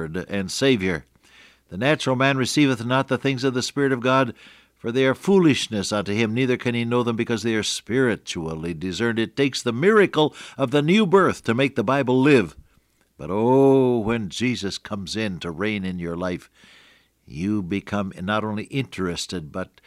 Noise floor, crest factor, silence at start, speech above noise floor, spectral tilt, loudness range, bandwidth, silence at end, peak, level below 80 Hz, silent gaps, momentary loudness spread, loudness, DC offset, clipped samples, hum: -62 dBFS; 16 dB; 0 s; 41 dB; -5.5 dB/octave; 8 LU; 14.5 kHz; 0.25 s; -6 dBFS; -56 dBFS; none; 12 LU; -22 LUFS; under 0.1%; under 0.1%; none